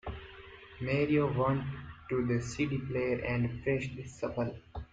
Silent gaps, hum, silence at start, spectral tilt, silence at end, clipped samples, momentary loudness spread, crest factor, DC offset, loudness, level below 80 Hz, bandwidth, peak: none; none; 0.05 s; -7 dB/octave; 0.05 s; under 0.1%; 17 LU; 16 dB; under 0.1%; -33 LUFS; -54 dBFS; 9.2 kHz; -16 dBFS